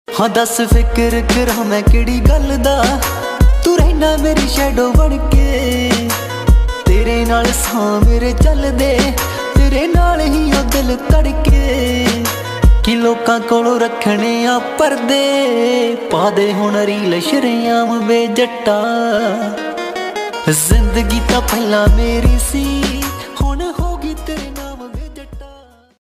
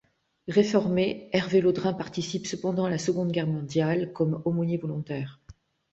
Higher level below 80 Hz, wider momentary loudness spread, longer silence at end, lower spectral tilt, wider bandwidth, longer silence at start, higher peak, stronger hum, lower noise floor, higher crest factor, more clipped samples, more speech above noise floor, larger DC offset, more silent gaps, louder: first, -16 dBFS vs -62 dBFS; about the same, 7 LU vs 9 LU; about the same, 0.45 s vs 0.4 s; second, -5 dB/octave vs -6.5 dB/octave; first, 15.5 kHz vs 8 kHz; second, 0.1 s vs 0.45 s; first, 0 dBFS vs -8 dBFS; neither; second, -42 dBFS vs -54 dBFS; second, 12 dB vs 18 dB; neither; about the same, 30 dB vs 28 dB; neither; neither; first, -14 LUFS vs -27 LUFS